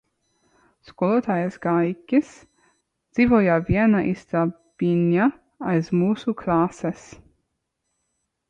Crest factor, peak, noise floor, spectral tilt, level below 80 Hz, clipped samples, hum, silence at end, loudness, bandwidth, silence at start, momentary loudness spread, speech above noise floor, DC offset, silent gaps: 16 dB; -8 dBFS; -77 dBFS; -8.5 dB/octave; -50 dBFS; under 0.1%; none; 1.55 s; -22 LUFS; 8.4 kHz; 0.9 s; 9 LU; 56 dB; under 0.1%; none